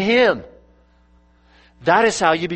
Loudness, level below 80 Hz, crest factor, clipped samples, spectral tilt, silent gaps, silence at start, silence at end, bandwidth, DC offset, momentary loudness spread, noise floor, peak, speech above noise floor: -17 LUFS; -52 dBFS; 18 dB; under 0.1%; -4 dB/octave; none; 0 s; 0 s; 8.8 kHz; under 0.1%; 10 LU; -54 dBFS; -2 dBFS; 38 dB